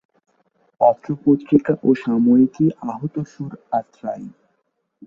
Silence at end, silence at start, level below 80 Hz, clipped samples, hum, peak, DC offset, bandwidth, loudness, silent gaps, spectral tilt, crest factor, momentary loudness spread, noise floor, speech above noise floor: 0.75 s; 0.8 s; -60 dBFS; under 0.1%; none; -2 dBFS; under 0.1%; 7 kHz; -19 LUFS; none; -9.5 dB/octave; 18 dB; 15 LU; -71 dBFS; 52 dB